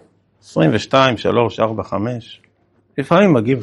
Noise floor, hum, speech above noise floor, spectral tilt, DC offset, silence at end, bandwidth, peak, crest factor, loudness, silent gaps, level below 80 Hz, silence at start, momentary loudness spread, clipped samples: -58 dBFS; none; 43 dB; -6.5 dB/octave; under 0.1%; 0 s; 11.5 kHz; 0 dBFS; 16 dB; -16 LUFS; none; -54 dBFS; 0.55 s; 13 LU; under 0.1%